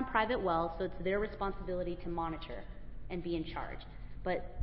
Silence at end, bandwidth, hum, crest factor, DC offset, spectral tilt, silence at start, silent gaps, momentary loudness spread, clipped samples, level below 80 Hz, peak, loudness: 0 s; 5.6 kHz; none; 20 dB; under 0.1%; -4.5 dB/octave; 0 s; none; 16 LU; under 0.1%; -48 dBFS; -16 dBFS; -37 LUFS